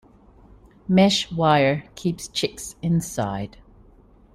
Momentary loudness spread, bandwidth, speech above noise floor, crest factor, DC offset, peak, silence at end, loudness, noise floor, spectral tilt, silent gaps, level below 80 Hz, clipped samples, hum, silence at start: 12 LU; 15 kHz; 30 dB; 18 dB; under 0.1%; -4 dBFS; 0.85 s; -22 LUFS; -52 dBFS; -5 dB/octave; none; -50 dBFS; under 0.1%; none; 0.9 s